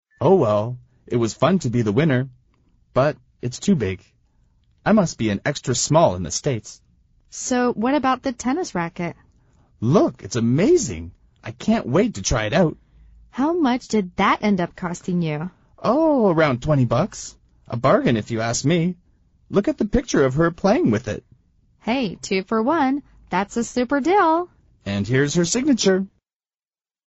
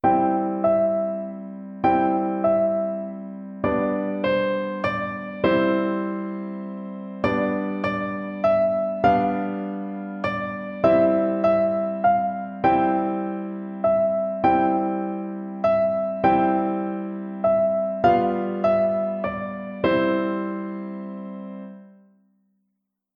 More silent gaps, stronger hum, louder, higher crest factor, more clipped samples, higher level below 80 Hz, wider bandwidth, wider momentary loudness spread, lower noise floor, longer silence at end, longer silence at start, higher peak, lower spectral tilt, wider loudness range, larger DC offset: neither; neither; about the same, -21 LUFS vs -23 LUFS; about the same, 18 dB vs 18 dB; neither; first, -44 dBFS vs -54 dBFS; first, 8.2 kHz vs 5.8 kHz; about the same, 13 LU vs 12 LU; first, under -90 dBFS vs -77 dBFS; second, 1 s vs 1.3 s; first, 0.2 s vs 0.05 s; about the same, -4 dBFS vs -6 dBFS; second, -5.5 dB/octave vs -9 dB/octave; about the same, 3 LU vs 3 LU; neither